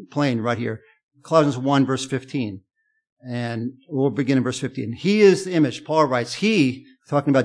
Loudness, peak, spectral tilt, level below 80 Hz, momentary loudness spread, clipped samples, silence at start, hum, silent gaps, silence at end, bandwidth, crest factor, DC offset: -21 LUFS; -4 dBFS; -6 dB/octave; -68 dBFS; 13 LU; under 0.1%; 0 s; none; 1.03-1.09 s, 3.12-3.17 s; 0 s; 10.5 kHz; 18 dB; under 0.1%